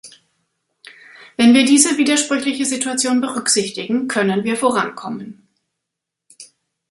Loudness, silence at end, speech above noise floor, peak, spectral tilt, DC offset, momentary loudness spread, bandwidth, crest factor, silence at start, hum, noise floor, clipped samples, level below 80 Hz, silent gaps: -16 LUFS; 0.45 s; 65 dB; 0 dBFS; -2.5 dB/octave; under 0.1%; 16 LU; 11.5 kHz; 18 dB; 0.05 s; none; -81 dBFS; under 0.1%; -64 dBFS; none